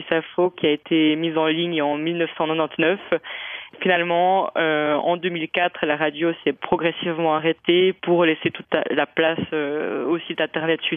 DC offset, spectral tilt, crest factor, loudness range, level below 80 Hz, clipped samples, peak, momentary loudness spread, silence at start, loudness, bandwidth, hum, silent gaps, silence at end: under 0.1%; -9 dB/octave; 18 dB; 1 LU; -64 dBFS; under 0.1%; -2 dBFS; 6 LU; 0 s; -21 LUFS; 3.8 kHz; none; none; 0 s